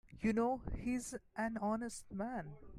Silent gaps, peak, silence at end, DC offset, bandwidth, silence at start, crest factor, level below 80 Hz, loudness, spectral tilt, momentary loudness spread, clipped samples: none; -24 dBFS; 0 s; under 0.1%; 15 kHz; 0.05 s; 16 dB; -56 dBFS; -40 LUFS; -6 dB/octave; 9 LU; under 0.1%